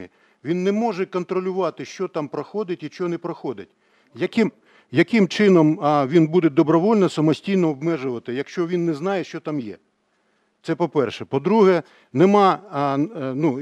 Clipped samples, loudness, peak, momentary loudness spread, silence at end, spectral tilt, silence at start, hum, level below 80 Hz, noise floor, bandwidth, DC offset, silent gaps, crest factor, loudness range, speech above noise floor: under 0.1%; -21 LUFS; -2 dBFS; 12 LU; 0 s; -7 dB/octave; 0 s; none; -74 dBFS; -67 dBFS; 9.4 kHz; under 0.1%; none; 18 dB; 9 LU; 47 dB